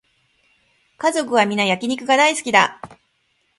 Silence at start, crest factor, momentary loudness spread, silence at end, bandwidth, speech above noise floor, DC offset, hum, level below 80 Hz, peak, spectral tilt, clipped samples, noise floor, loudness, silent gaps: 1 s; 20 dB; 7 LU; 0.65 s; 11.5 kHz; 48 dB; under 0.1%; none; -66 dBFS; 0 dBFS; -3 dB/octave; under 0.1%; -66 dBFS; -17 LUFS; none